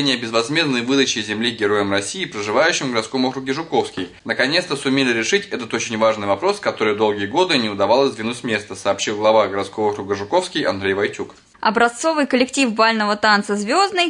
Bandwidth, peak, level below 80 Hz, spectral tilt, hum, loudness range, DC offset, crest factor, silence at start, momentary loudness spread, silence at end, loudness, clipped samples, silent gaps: 11 kHz; -2 dBFS; -62 dBFS; -3.5 dB/octave; none; 2 LU; under 0.1%; 16 dB; 0 s; 7 LU; 0 s; -19 LUFS; under 0.1%; none